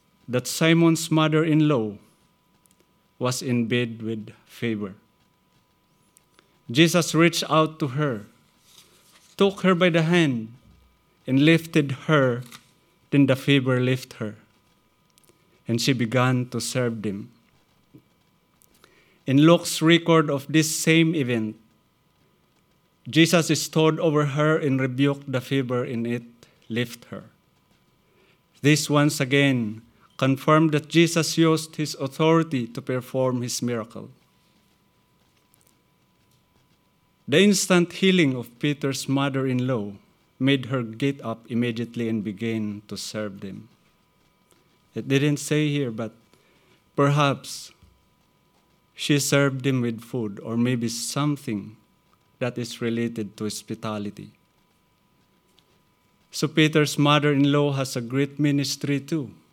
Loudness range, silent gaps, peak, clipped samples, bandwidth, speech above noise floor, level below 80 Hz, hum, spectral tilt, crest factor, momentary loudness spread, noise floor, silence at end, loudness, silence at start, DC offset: 9 LU; none; -2 dBFS; under 0.1%; 18 kHz; 42 dB; -72 dBFS; none; -5 dB/octave; 22 dB; 14 LU; -64 dBFS; 0.2 s; -23 LUFS; 0.3 s; under 0.1%